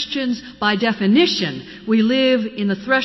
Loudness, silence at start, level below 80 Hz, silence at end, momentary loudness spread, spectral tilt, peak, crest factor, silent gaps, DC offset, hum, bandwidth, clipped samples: -18 LUFS; 0 s; -56 dBFS; 0 s; 8 LU; -5.5 dB/octave; -4 dBFS; 14 dB; none; under 0.1%; none; 6.2 kHz; under 0.1%